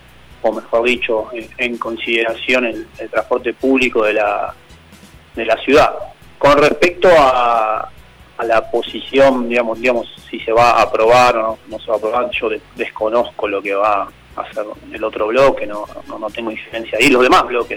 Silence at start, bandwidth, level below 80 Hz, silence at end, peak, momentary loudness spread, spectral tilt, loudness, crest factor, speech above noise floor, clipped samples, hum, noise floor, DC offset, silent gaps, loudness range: 0.3 s; 17.5 kHz; -42 dBFS; 0 s; -2 dBFS; 16 LU; -4.5 dB/octave; -15 LUFS; 14 dB; 27 dB; under 0.1%; none; -42 dBFS; under 0.1%; none; 5 LU